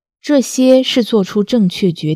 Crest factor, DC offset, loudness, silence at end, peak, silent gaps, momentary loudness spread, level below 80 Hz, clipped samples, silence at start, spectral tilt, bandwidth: 14 dB; under 0.1%; -13 LUFS; 0 s; 0 dBFS; none; 5 LU; -58 dBFS; 0.1%; 0.25 s; -5.5 dB/octave; 15.5 kHz